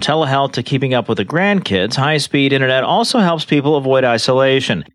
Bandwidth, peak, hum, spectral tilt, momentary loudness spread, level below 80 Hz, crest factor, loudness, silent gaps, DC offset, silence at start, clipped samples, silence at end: 13 kHz; -2 dBFS; none; -5 dB/octave; 4 LU; -56 dBFS; 12 dB; -14 LUFS; none; under 0.1%; 0 s; under 0.1%; 0.1 s